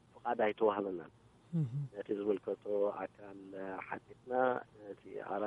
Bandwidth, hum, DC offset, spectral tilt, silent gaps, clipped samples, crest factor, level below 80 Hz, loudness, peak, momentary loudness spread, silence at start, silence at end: 7.8 kHz; none; under 0.1%; -9 dB/octave; none; under 0.1%; 22 dB; -76 dBFS; -38 LUFS; -16 dBFS; 15 LU; 0.15 s; 0 s